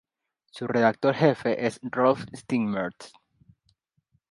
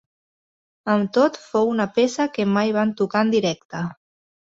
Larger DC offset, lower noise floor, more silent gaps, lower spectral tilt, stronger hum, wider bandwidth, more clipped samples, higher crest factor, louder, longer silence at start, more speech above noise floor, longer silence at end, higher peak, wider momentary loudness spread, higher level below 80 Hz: neither; second, -76 dBFS vs under -90 dBFS; second, none vs 3.65-3.69 s; about the same, -6.5 dB/octave vs -5.5 dB/octave; neither; first, 11.5 kHz vs 7.8 kHz; neither; about the same, 20 dB vs 18 dB; second, -25 LUFS vs -21 LUFS; second, 0.55 s vs 0.85 s; second, 51 dB vs over 70 dB; first, 1.25 s vs 0.5 s; about the same, -6 dBFS vs -4 dBFS; about the same, 9 LU vs 10 LU; about the same, -68 dBFS vs -64 dBFS